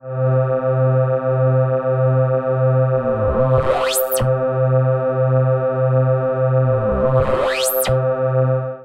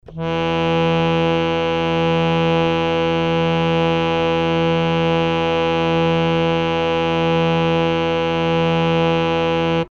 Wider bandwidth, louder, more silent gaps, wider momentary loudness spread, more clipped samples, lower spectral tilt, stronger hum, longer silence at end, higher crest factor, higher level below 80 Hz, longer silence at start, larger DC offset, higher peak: first, 16 kHz vs 7 kHz; about the same, -17 LUFS vs -18 LUFS; neither; about the same, 2 LU vs 2 LU; neither; about the same, -6 dB/octave vs -7 dB/octave; neither; about the same, 0 s vs 0.05 s; about the same, 14 dB vs 14 dB; about the same, -38 dBFS vs -42 dBFS; about the same, 0.05 s vs 0.1 s; neither; about the same, -4 dBFS vs -4 dBFS